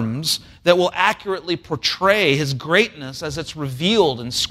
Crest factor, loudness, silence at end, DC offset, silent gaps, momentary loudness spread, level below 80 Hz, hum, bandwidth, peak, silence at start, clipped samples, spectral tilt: 18 dB; -19 LUFS; 0 s; under 0.1%; none; 11 LU; -50 dBFS; none; 16 kHz; -2 dBFS; 0 s; under 0.1%; -4 dB/octave